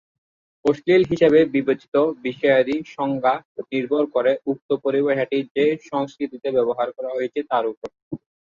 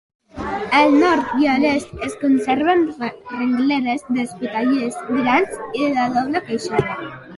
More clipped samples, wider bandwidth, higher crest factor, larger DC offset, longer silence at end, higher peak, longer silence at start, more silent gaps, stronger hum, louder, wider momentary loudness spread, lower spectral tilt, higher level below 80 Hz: neither; second, 7.4 kHz vs 11.5 kHz; about the same, 18 dB vs 16 dB; neither; first, 0.4 s vs 0 s; about the same, -4 dBFS vs -2 dBFS; first, 0.65 s vs 0.35 s; first, 1.88-1.92 s, 3.45-3.55 s, 4.62-4.69 s, 5.51-5.55 s, 7.77-7.82 s, 8.02-8.11 s vs none; neither; about the same, -21 LUFS vs -19 LUFS; about the same, 11 LU vs 11 LU; first, -7 dB/octave vs -5.5 dB/octave; second, -62 dBFS vs -50 dBFS